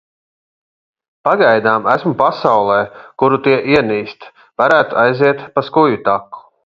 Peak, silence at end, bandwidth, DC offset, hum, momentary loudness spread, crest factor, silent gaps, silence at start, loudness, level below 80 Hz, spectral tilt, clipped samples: 0 dBFS; 0.25 s; 7.4 kHz; under 0.1%; none; 9 LU; 14 dB; none; 1.25 s; -14 LUFS; -54 dBFS; -7.5 dB/octave; under 0.1%